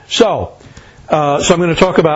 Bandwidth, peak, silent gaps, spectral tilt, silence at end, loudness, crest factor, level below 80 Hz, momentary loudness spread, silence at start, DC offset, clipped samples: 8 kHz; 0 dBFS; none; -4.5 dB/octave; 0 s; -13 LUFS; 14 dB; -38 dBFS; 9 LU; 0.1 s; under 0.1%; 0.2%